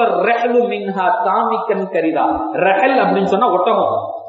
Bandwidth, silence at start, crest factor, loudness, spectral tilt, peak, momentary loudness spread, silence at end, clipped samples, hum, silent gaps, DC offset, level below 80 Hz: 7.8 kHz; 0 s; 14 dB; -15 LUFS; -7 dB/octave; -2 dBFS; 5 LU; 0 s; under 0.1%; none; none; under 0.1%; -54 dBFS